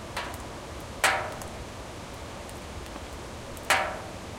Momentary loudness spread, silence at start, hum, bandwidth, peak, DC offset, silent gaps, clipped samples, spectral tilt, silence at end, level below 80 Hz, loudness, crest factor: 15 LU; 0 s; none; 17 kHz; -8 dBFS; under 0.1%; none; under 0.1%; -2.5 dB/octave; 0 s; -48 dBFS; -32 LUFS; 26 dB